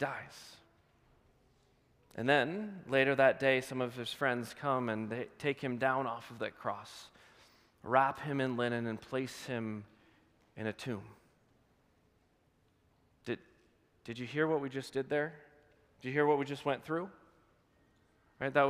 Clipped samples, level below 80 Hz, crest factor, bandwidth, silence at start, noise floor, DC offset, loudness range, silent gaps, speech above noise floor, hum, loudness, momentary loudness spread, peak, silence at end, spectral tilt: under 0.1%; -76 dBFS; 24 dB; 15.5 kHz; 0 s; -72 dBFS; under 0.1%; 14 LU; none; 38 dB; none; -35 LUFS; 16 LU; -12 dBFS; 0 s; -5.5 dB/octave